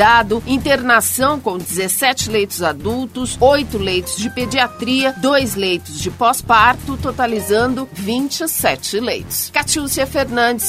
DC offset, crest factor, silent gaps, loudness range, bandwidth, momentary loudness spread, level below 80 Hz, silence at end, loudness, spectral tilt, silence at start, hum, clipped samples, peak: under 0.1%; 16 dB; none; 2 LU; 16 kHz; 8 LU; -38 dBFS; 0 s; -16 LUFS; -3 dB/octave; 0 s; none; under 0.1%; 0 dBFS